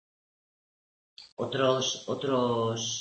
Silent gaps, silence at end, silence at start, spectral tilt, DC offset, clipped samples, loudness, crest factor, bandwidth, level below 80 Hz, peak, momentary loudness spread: 1.32-1.37 s; 0 s; 1.2 s; -4 dB/octave; under 0.1%; under 0.1%; -29 LUFS; 18 dB; 8.6 kHz; -70 dBFS; -14 dBFS; 9 LU